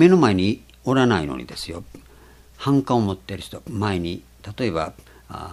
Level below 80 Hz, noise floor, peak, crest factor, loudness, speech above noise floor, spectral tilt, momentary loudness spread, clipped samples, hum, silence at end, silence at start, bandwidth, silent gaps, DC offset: -48 dBFS; -48 dBFS; -2 dBFS; 20 dB; -22 LUFS; 28 dB; -6.5 dB/octave; 16 LU; under 0.1%; none; 0 s; 0 s; 13.5 kHz; none; under 0.1%